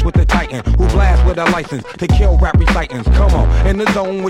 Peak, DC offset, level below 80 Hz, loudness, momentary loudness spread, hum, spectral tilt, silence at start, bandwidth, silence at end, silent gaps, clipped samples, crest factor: 0 dBFS; under 0.1%; -14 dBFS; -14 LUFS; 5 LU; none; -7 dB/octave; 0 s; 10 kHz; 0 s; none; under 0.1%; 12 dB